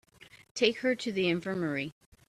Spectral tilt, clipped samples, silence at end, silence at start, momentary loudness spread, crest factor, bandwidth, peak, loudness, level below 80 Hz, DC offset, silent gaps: -5 dB/octave; under 0.1%; 0.4 s; 0.2 s; 11 LU; 20 dB; 13.5 kHz; -12 dBFS; -30 LUFS; -70 dBFS; under 0.1%; 0.51-0.55 s